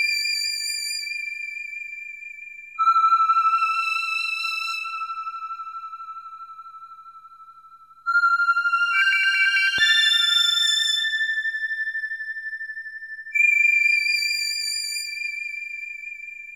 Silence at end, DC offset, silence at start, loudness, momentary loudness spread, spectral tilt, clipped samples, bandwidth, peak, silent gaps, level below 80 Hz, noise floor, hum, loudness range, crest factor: 0 s; under 0.1%; 0 s; -20 LUFS; 19 LU; 4 dB/octave; under 0.1%; 18 kHz; -8 dBFS; none; -74 dBFS; -49 dBFS; 50 Hz at -80 dBFS; 10 LU; 16 dB